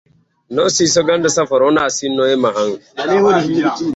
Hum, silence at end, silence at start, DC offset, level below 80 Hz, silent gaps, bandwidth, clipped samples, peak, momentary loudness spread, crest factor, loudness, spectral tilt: none; 0 s; 0.5 s; under 0.1%; -54 dBFS; none; 8.2 kHz; under 0.1%; -2 dBFS; 7 LU; 12 dB; -15 LUFS; -3.5 dB/octave